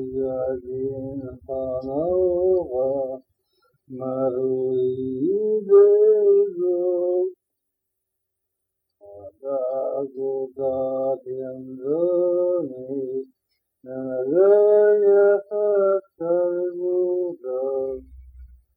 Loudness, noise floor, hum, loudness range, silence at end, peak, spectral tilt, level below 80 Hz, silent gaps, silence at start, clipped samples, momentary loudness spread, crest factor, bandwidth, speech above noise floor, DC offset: -22 LUFS; -80 dBFS; none; 9 LU; 0.3 s; -6 dBFS; -11 dB/octave; -56 dBFS; none; 0 s; under 0.1%; 15 LU; 16 dB; 1.9 kHz; 59 dB; under 0.1%